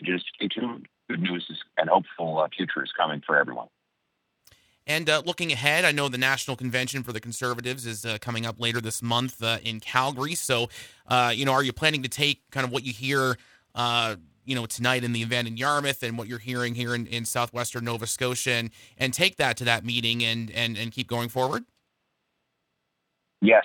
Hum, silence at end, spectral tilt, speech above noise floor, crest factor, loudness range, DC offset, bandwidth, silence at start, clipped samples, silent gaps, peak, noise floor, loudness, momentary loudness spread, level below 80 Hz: none; 0 s; -3.5 dB/octave; 51 dB; 22 dB; 3 LU; under 0.1%; 19 kHz; 0 s; under 0.1%; none; -4 dBFS; -78 dBFS; -26 LUFS; 9 LU; -64 dBFS